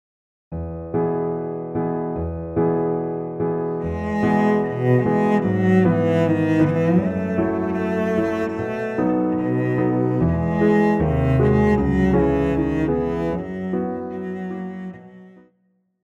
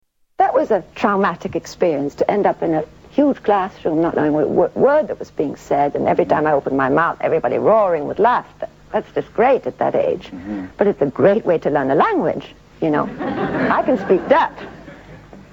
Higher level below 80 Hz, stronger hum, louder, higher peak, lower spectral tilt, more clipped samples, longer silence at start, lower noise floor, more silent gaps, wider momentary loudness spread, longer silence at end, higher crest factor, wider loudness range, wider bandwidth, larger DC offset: first, -38 dBFS vs -50 dBFS; neither; second, -21 LUFS vs -18 LUFS; second, -6 dBFS vs 0 dBFS; first, -9.5 dB/octave vs -7 dB/octave; neither; about the same, 0.5 s vs 0.4 s; first, -66 dBFS vs -40 dBFS; neither; about the same, 10 LU vs 9 LU; first, 0.75 s vs 0.15 s; about the same, 16 dB vs 18 dB; first, 5 LU vs 2 LU; second, 8.2 kHz vs 17 kHz; neither